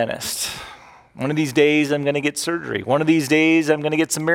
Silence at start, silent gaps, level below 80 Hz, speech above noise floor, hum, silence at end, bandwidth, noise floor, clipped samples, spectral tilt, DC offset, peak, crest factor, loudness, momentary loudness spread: 0 s; none; -58 dBFS; 24 dB; none; 0 s; 17 kHz; -43 dBFS; under 0.1%; -4.5 dB/octave; under 0.1%; -4 dBFS; 16 dB; -19 LUFS; 10 LU